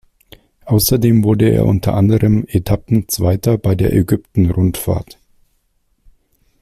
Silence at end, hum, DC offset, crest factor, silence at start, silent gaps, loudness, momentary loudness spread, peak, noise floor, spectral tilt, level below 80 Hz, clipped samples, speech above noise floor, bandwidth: 1.6 s; none; under 0.1%; 14 dB; 0.65 s; none; -15 LUFS; 5 LU; -2 dBFS; -62 dBFS; -6.5 dB/octave; -34 dBFS; under 0.1%; 48 dB; 16 kHz